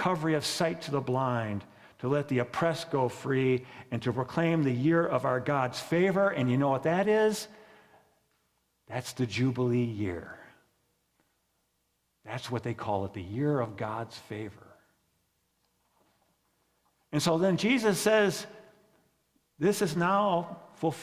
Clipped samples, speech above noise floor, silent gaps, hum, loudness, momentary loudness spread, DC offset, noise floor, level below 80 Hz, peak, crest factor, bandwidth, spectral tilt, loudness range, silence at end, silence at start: under 0.1%; 48 dB; none; none; -29 LUFS; 13 LU; under 0.1%; -76 dBFS; -62 dBFS; -12 dBFS; 18 dB; 16 kHz; -5.5 dB/octave; 9 LU; 0 s; 0 s